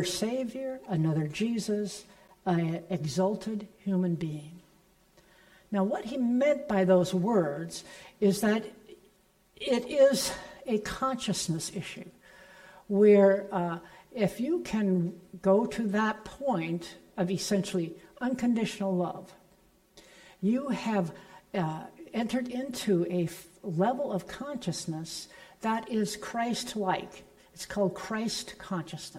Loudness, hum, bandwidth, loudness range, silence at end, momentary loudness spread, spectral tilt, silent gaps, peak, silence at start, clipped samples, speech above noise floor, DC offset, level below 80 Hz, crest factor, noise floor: -30 LUFS; none; 16 kHz; 6 LU; 0 s; 14 LU; -5.5 dB/octave; none; -12 dBFS; 0 s; under 0.1%; 36 dB; under 0.1%; -62 dBFS; 18 dB; -65 dBFS